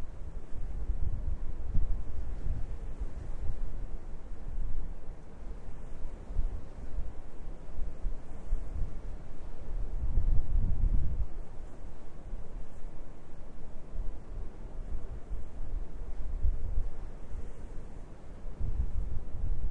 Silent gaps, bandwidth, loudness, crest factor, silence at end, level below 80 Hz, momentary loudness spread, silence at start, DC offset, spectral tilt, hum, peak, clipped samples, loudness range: none; 2.4 kHz; -41 LUFS; 18 dB; 0 s; -34 dBFS; 14 LU; 0 s; under 0.1%; -8.5 dB/octave; none; -10 dBFS; under 0.1%; 8 LU